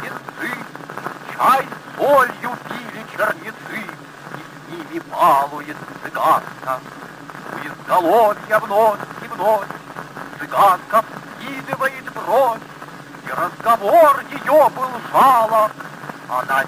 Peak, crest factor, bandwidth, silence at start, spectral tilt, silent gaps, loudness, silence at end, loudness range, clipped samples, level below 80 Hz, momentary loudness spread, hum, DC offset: -2 dBFS; 16 dB; 16 kHz; 0 s; -4.5 dB/octave; none; -17 LUFS; 0 s; 6 LU; under 0.1%; -62 dBFS; 19 LU; none; under 0.1%